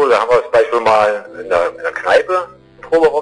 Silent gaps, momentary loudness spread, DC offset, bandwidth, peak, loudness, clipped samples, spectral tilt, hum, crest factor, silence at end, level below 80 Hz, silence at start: none; 8 LU; under 0.1%; 10.5 kHz; -4 dBFS; -14 LUFS; under 0.1%; -4 dB/octave; none; 10 dB; 0 s; -50 dBFS; 0 s